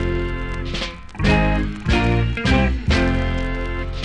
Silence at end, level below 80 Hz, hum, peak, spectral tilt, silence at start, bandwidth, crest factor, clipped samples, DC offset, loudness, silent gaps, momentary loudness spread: 0 s; -24 dBFS; none; -4 dBFS; -6.5 dB/octave; 0 s; 10 kHz; 16 dB; under 0.1%; under 0.1%; -21 LUFS; none; 9 LU